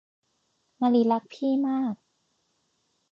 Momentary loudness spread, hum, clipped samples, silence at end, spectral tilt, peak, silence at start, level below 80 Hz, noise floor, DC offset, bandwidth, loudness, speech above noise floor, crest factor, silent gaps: 9 LU; none; under 0.1%; 1.15 s; -7.5 dB/octave; -12 dBFS; 0.8 s; -82 dBFS; -73 dBFS; under 0.1%; 7 kHz; -26 LUFS; 49 dB; 16 dB; none